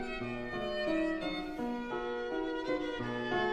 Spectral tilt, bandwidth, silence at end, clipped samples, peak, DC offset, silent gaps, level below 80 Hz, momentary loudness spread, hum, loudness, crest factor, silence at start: -6 dB/octave; 10.5 kHz; 0 s; under 0.1%; -20 dBFS; under 0.1%; none; -54 dBFS; 5 LU; none; -36 LUFS; 14 dB; 0 s